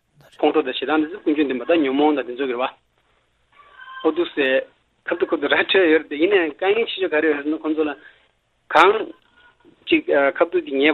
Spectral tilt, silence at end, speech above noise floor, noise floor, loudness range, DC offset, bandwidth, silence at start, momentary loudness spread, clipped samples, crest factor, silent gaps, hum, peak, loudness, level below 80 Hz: -5 dB/octave; 0 s; 45 dB; -64 dBFS; 4 LU; under 0.1%; 7.8 kHz; 0.4 s; 10 LU; under 0.1%; 20 dB; none; none; 0 dBFS; -20 LUFS; -66 dBFS